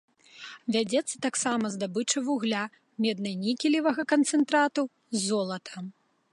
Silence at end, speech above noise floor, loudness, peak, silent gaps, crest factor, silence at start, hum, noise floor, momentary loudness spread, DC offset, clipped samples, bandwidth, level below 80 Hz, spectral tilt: 0.4 s; 20 dB; -28 LUFS; -12 dBFS; none; 16 dB; 0.35 s; none; -47 dBFS; 13 LU; under 0.1%; under 0.1%; 11.5 kHz; -80 dBFS; -3.5 dB/octave